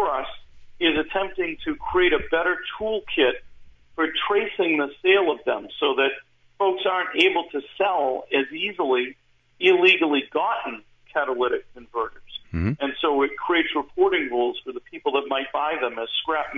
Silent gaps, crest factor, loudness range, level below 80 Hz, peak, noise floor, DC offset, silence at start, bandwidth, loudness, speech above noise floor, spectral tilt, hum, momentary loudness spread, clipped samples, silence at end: none; 18 dB; 3 LU; -50 dBFS; -6 dBFS; -46 dBFS; under 0.1%; 0 s; 7.8 kHz; -23 LUFS; 23 dB; -6 dB/octave; none; 11 LU; under 0.1%; 0 s